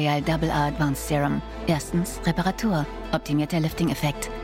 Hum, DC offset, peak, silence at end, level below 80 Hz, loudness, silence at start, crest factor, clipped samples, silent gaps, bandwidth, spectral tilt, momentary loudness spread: none; under 0.1%; -10 dBFS; 0 s; -38 dBFS; -25 LUFS; 0 s; 14 dB; under 0.1%; none; 16.5 kHz; -5.5 dB/octave; 4 LU